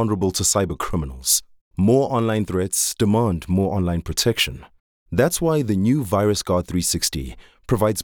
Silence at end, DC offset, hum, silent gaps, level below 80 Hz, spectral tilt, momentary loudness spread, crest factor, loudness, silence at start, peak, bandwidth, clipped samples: 0 s; under 0.1%; none; 1.61-1.71 s, 4.80-5.06 s; -42 dBFS; -4.5 dB/octave; 6 LU; 16 dB; -20 LUFS; 0 s; -4 dBFS; 19.5 kHz; under 0.1%